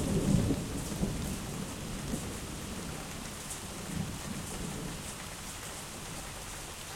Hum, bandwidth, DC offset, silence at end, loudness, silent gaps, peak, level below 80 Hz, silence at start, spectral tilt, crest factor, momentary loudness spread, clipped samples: none; 16.5 kHz; under 0.1%; 0 s; -37 LUFS; none; -14 dBFS; -46 dBFS; 0 s; -4.5 dB/octave; 22 dB; 10 LU; under 0.1%